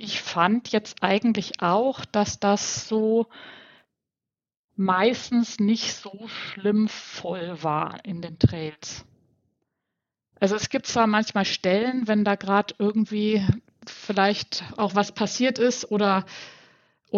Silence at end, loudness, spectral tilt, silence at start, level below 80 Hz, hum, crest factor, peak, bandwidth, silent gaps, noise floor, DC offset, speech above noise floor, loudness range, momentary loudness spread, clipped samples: 0 s; -24 LUFS; -5 dB/octave; 0 s; -54 dBFS; none; 22 dB; -2 dBFS; 7.6 kHz; 4.57-4.68 s; under -90 dBFS; under 0.1%; over 66 dB; 4 LU; 13 LU; under 0.1%